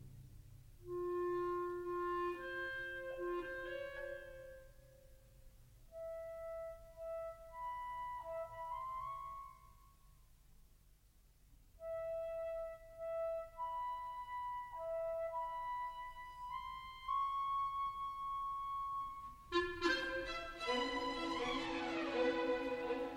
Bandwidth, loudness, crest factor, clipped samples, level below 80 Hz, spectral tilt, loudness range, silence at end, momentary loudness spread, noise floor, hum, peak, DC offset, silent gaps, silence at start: 16.5 kHz; -43 LUFS; 20 dB; under 0.1%; -62 dBFS; -4.5 dB/octave; 11 LU; 0 s; 13 LU; -68 dBFS; none; -24 dBFS; under 0.1%; none; 0 s